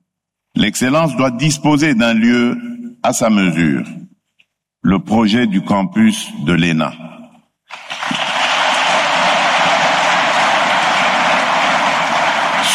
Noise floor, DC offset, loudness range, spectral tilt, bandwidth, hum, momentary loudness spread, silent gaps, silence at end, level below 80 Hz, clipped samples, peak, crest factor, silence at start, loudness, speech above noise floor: -76 dBFS; under 0.1%; 4 LU; -4 dB/octave; 14 kHz; none; 8 LU; none; 0 s; -48 dBFS; under 0.1%; -4 dBFS; 12 dB; 0.55 s; -14 LUFS; 62 dB